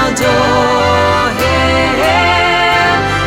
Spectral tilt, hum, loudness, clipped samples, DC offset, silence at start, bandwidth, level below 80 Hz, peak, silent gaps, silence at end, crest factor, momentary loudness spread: -4 dB/octave; none; -10 LUFS; under 0.1%; under 0.1%; 0 s; 17 kHz; -28 dBFS; -2 dBFS; none; 0 s; 10 dB; 2 LU